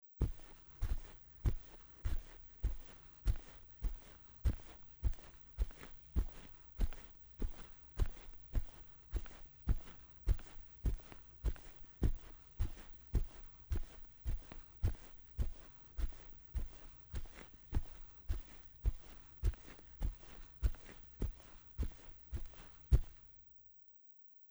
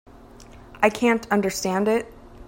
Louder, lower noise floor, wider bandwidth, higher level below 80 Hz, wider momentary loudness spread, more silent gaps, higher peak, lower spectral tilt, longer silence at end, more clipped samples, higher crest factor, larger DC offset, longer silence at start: second, -46 LUFS vs -22 LUFS; first, -62 dBFS vs -45 dBFS; first, over 20 kHz vs 16.5 kHz; first, -42 dBFS vs -50 dBFS; first, 14 LU vs 5 LU; neither; second, -18 dBFS vs -4 dBFS; first, -7 dB/octave vs -4.5 dB/octave; about the same, 0.05 s vs 0.05 s; neither; about the same, 24 dB vs 20 dB; neither; second, 0.15 s vs 0.4 s